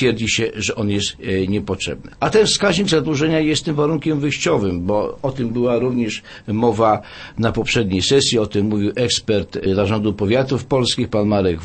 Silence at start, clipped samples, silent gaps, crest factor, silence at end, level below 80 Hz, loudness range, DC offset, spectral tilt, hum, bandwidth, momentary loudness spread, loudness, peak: 0 s; under 0.1%; none; 16 dB; 0 s; -42 dBFS; 2 LU; under 0.1%; -4.5 dB/octave; none; 8.8 kHz; 7 LU; -18 LUFS; -2 dBFS